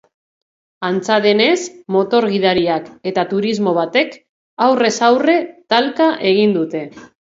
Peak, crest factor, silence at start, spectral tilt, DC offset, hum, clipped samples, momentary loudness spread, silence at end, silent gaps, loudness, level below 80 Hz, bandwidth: 0 dBFS; 16 dB; 0.8 s; -4.5 dB/octave; under 0.1%; none; under 0.1%; 8 LU; 0.15 s; 4.29-4.57 s; -16 LUFS; -60 dBFS; 7.8 kHz